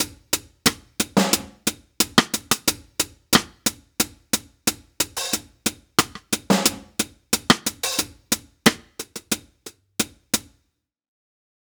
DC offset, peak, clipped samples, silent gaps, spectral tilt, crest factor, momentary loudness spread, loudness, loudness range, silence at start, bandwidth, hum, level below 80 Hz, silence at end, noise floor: under 0.1%; 0 dBFS; under 0.1%; none; -2 dB/octave; 24 dB; 9 LU; -23 LUFS; 4 LU; 0 s; over 20 kHz; none; -52 dBFS; 1.3 s; -74 dBFS